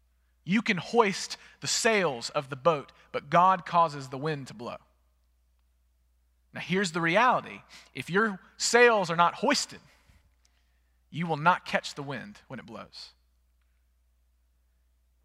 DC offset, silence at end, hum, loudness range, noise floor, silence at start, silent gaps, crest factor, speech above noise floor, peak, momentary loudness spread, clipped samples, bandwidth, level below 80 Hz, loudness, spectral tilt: under 0.1%; 2.15 s; 60 Hz at -60 dBFS; 8 LU; -68 dBFS; 0.45 s; none; 22 dB; 41 dB; -8 dBFS; 21 LU; under 0.1%; 15.5 kHz; -68 dBFS; -26 LUFS; -3.5 dB/octave